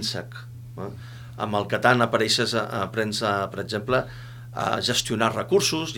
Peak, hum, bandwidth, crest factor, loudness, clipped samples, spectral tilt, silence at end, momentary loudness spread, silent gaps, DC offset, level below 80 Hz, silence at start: -2 dBFS; none; 18.5 kHz; 22 dB; -24 LUFS; under 0.1%; -4 dB/octave; 0 s; 18 LU; none; under 0.1%; -54 dBFS; 0 s